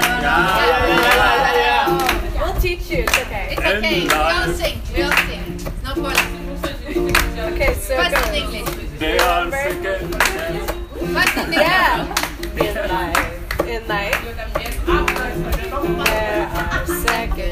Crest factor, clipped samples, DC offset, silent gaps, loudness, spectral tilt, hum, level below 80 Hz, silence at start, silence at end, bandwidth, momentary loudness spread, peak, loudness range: 18 dB; under 0.1%; under 0.1%; none; -18 LUFS; -3.5 dB/octave; none; -28 dBFS; 0 s; 0 s; 16 kHz; 10 LU; 0 dBFS; 4 LU